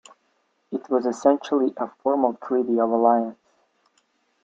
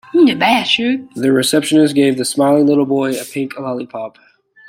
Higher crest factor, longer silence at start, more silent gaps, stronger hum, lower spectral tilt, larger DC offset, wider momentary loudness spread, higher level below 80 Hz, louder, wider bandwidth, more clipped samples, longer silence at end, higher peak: first, 20 dB vs 14 dB; first, 0.7 s vs 0.15 s; neither; neither; first, -6 dB/octave vs -4.5 dB/octave; neither; second, 9 LU vs 12 LU; second, -74 dBFS vs -60 dBFS; second, -23 LUFS vs -14 LUFS; second, 7.8 kHz vs 16.5 kHz; neither; first, 1.1 s vs 0.6 s; second, -4 dBFS vs 0 dBFS